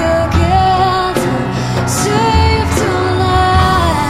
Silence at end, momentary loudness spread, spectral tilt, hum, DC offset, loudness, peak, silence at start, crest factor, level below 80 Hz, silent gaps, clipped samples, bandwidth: 0 s; 5 LU; -5 dB/octave; none; under 0.1%; -12 LUFS; 0 dBFS; 0 s; 12 dB; -22 dBFS; none; under 0.1%; 15 kHz